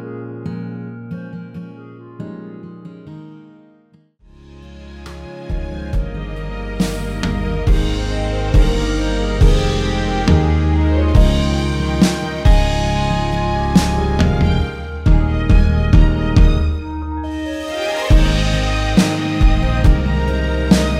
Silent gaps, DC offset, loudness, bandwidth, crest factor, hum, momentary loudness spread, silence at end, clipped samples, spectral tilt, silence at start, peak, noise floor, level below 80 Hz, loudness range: none; under 0.1%; -17 LUFS; 12.5 kHz; 16 dB; none; 18 LU; 0 s; under 0.1%; -6.5 dB/octave; 0 s; 0 dBFS; -52 dBFS; -18 dBFS; 18 LU